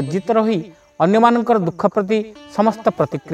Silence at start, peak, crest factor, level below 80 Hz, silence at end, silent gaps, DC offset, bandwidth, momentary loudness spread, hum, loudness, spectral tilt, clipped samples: 0 s; 0 dBFS; 16 dB; -60 dBFS; 0 s; none; under 0.1%; 9 kHz; 9 LU; none; -17 LUFS; -7.5 dB/octave; under 0.1%